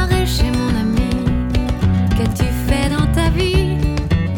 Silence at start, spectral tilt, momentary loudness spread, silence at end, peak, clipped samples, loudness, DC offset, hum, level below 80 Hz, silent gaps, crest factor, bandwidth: 0 s; -6.5 dB/octave; 3 LU; 0 s; -4 dBFS; under 0.1%; -17 LUFS; under 0.1%; none; -20 dBFS; none; 12 dB; 18.5 kHz